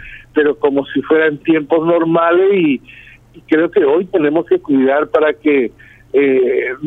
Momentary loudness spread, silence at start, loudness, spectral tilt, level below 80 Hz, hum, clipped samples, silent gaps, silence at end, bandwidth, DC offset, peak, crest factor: 5 LU; 0 s; -14 LUFS; -8.5 dB/octave; -50 dBFS; none; under 0.1%; none; 0 s; 4 kHz; under 0.1%; 0 dBFS; 14 dB